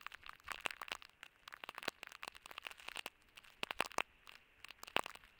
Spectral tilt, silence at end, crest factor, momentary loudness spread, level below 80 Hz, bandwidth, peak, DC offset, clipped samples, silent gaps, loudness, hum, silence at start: -1 dB/octave; 0 s; 36 dB; 17 LU; -76 dBFS; 18 kHz; -12 dBFS; under 0.1%; under 0.1%; none; -46 LUFS; none; 0 s